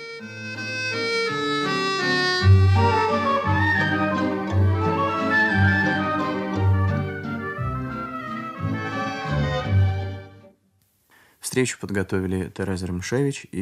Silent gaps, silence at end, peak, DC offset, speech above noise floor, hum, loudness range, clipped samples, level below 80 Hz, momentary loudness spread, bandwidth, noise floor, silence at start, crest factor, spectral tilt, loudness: none; 0 s; -6 dBFS; under 0.1%; 39 dB; none; 7 LU; under 0.1%; -46 dBFS; 12 LU; 12.5 kHz; -65 dBFS; 0 s; 16 dB; -5.5 dB/octave; -22 LUFS